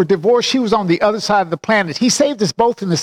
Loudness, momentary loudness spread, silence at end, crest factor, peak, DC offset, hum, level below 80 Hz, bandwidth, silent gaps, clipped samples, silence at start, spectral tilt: -15 LUFS; 3 LU; 0 s; 12 dB; -4 dBFS; under 0.1%; none; -52 dBFS; 15.5 kHz; none; under 0.1%; 0 s; -4 dB/octave